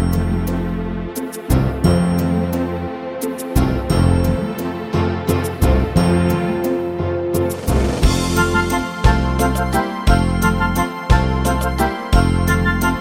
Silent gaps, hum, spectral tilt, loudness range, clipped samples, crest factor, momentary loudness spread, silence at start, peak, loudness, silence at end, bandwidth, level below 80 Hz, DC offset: none; none; -6 dB/octave; 2 LU; under 0.1%; 16 dB; 7 LU; 0 s; -2 dBFS; -18 LUFS; 0 s; 16.5 kHz; -24 dBFS; under 0.1%